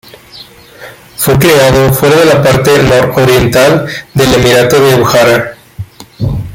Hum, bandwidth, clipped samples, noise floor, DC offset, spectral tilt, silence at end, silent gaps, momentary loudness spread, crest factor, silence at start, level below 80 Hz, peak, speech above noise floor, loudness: none; 17.5 kHz; under 0.1%; -33 dBFS; under 0.1%; -5 dB/octave; 0 s; none; 15 LU; 8 dB; 0.35 s; -30 dBFS; 0 dBFS; 27 dB; -7 LUFS